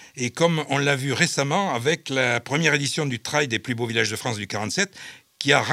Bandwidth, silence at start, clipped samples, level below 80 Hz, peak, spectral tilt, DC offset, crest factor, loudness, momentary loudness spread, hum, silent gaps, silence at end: 16 kHz; 0 s; under 0.1%; -72 dBFS; 0 dBFS; -3.5 dB/octave; under 0.1%; 22 dB; -23 LUFS; 7 LU; none; none; 0 s